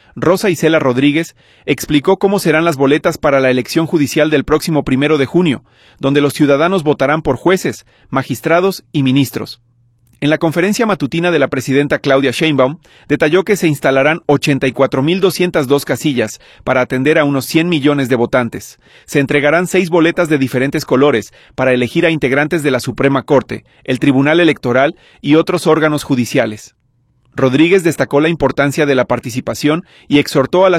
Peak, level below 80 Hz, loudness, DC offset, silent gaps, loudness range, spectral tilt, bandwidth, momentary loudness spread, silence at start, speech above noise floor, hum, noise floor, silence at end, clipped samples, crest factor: 0 dBFS; -44 dBFS; -13 LUFS; under 0.1%; none; 2 LU; -5.5 dB/octave; 15.5 kHz; 7 LU; 0.15 s; 44 dB; none; -57 dBFS; 0 s; under 0.1%; 14 dB